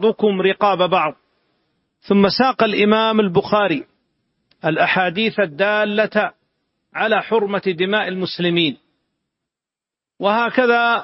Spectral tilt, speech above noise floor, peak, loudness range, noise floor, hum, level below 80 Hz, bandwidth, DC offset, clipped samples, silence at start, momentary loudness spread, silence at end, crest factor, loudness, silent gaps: -9.5 dB/octave; 71 dB; -2 dBFS; 4 LU; -88 dBFS; none; -60 dBFS; 5.8 kHz; under 0.1%; under 0.1%; 0 s; 7 LU; 0 s; 16 dB; -17 LUFS; none